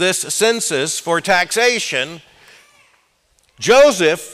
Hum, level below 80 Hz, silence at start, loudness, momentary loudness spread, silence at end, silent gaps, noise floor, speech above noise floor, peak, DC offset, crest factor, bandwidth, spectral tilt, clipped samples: none; -54 dBFS; 0 s; -15 LUFS; 10 LU; 0 s; none; -59 dBFS; 44 dB; -4 dBFS; under 0.1%; 14 dB; 16 kHz; -2 dB/octave; under 0.1%